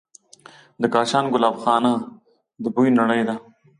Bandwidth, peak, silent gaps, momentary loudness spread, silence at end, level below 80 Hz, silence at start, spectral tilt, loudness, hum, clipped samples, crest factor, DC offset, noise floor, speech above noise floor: 11 kHz; -4 dBFS; none; 10 LU; 0.4 s; -68 dBFS; 0.8 s; -5.5 dB/octave; -20 LUFS; none; under 0.1%; 18 dB; under 0.1%; -48 dBFS; 29 dB